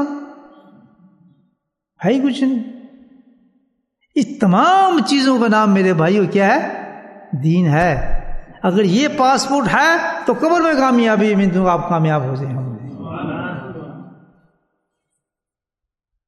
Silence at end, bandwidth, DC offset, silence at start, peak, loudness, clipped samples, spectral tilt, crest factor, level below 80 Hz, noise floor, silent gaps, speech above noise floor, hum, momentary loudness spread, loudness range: 2.2 s; 12 kHz; under 0.1%; 0 s; 0 dBFS; -16 LUFS; under 0.1%; -6 dB/octave; 16 dB; -36 dBFS; -86 dBFS; none; 72 dB; none; 16 LU; 9 LU